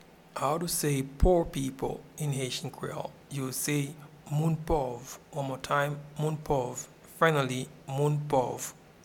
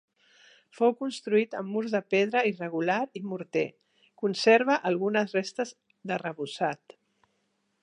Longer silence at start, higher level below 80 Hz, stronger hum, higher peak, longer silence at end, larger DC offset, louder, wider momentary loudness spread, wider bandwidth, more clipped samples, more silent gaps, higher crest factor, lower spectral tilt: second, 0.35 s vs 0.75 s; first, -42 dBFS vs -84 dBFS; neither; about the same, -8 dBFS vs -10 dBFS; second, 0.3 s vs 1.05 s; neither; second, -31 LUFS vs -28 LUFS; about the same, 13 LU vs 13 LU; first, 18.5 kHz vs 10.5 kHz; neither; neither; about the same, 22 dB vs 20 dB; about the same, -5 dB/octave vs -5 dB/octave